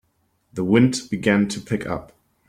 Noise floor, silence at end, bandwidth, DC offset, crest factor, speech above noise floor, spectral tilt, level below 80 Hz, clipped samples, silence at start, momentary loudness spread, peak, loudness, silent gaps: -67 dBFS; 0.45 s; 13 kHz; under 0.1%; 18 dB; 47 dB; -6 dB/octave; -54 dBFS; under 0.1%; 0.55 s; 13 LU; -4 dBFS; -21 LUFS; none